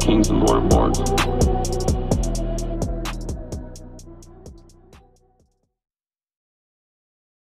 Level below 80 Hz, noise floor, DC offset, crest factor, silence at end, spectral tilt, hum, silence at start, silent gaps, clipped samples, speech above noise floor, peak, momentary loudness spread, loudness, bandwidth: -28 dBFS; -64 dBFS; under 0.1%; 20 dB; 2.6 s; -5.5 dB/octave; none; 0 s; none; under 0.1%; 46 dB; -4 dBFS; 22 LU; -21 LUFS; 15 kHz